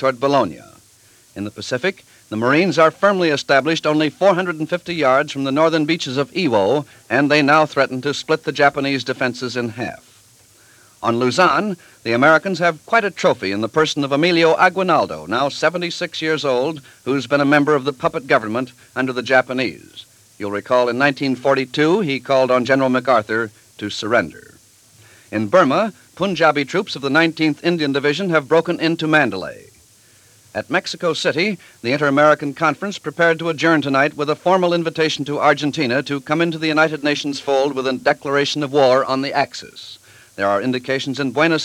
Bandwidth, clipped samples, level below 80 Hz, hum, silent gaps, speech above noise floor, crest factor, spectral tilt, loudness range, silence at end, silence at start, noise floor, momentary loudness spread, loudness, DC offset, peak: 15 kHz; under 0.1%; -62 dBFS; none; none; 33 dB; 18 dB; -5 dB/octave; 3 LU; 0 s; 0 s; -51 dBFS; 10 LU; -18 LUFS; under 0.1%; 0 dBFS